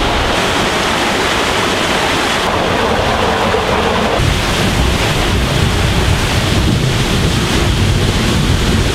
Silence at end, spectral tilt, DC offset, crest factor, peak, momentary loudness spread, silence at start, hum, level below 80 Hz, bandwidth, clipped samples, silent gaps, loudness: 0 s; -4.5 dB/octave; under 0.1%; 12 dB; 0 dBFS; 1 LU; 0 s; none; -22 dBFS; 16 kHz; under 0.1%; none; -13 LUFS